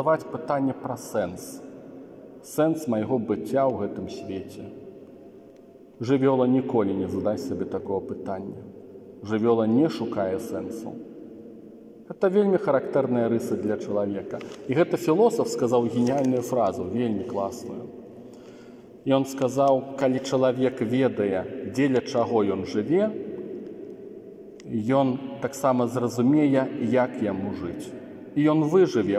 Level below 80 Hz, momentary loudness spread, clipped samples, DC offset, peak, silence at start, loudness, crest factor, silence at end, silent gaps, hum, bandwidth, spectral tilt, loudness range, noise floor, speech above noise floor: -68 dBFS; 21 LU; under 0.1%; under 0.1%; -6 dBFS; 0 s; -25 LUFS; 18 dB; 0 s; none; none; 15.5 kHz; -7 dB/octave; 4 LU; -49 dBFS; 25 dB